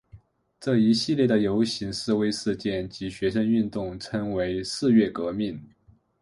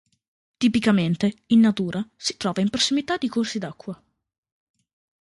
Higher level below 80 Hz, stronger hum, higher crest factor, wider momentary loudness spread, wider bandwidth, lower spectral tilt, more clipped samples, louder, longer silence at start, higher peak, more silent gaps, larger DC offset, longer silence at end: first, -54 dBFS vs -60 dBFS; neither; about the same, 16 dB vs 18 dB; second, 10 LU vs 14 LU; about the same, 11.5 kHz vs 11.5 kHz; about the same, -6 dB/octave vs -5 dB/octave; neither; second, -25 LUFS vs -22 LUFS; second, 0.15 s vs 0.6 s; about the same, -8 dBFS vs -6 dBFS; neither; neither; second, 0.55 s vs 1.25 s